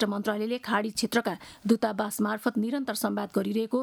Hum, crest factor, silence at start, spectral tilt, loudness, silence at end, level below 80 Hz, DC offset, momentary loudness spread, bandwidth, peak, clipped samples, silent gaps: none; 18 dB; 0 s; -4.5 dB/octave; -29 LUFS; 0 s; -68 dBFS; under 0.1%; 3 LU; 19 kHz; -10 dBFS; under 0.1%; none